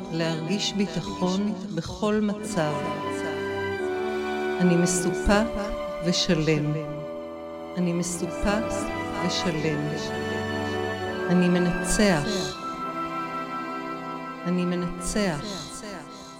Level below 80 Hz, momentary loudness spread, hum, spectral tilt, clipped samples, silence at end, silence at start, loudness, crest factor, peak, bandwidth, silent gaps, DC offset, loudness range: -44 dBFS; 10 LU; none; -5 dB/octave; under 0.1%; 0 s; 0 s; -26 LUFS; 18 dB; -8 dBFS; 16 kHz; none; under 0.1%; 4 LU